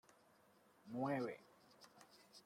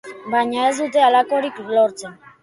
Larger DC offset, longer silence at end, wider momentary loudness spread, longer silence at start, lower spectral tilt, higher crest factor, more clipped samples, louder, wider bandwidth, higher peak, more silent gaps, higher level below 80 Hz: neither; second, 0.05 s vs 0.3 s; first, 24 LU vs 8 LU; first, 0.85 s vs 0.05 s; first, -6.5 dB/octave vs -3 dB/octave; first, 20 dB vs 14 dB; neither; second, -45 LUFS vs -18 LUFS; first, 16 kHz vs 11.5 kHz; second, -30 dBFS vs -4 dBFS; neither; second, -90 dBFS vs -68 dBFS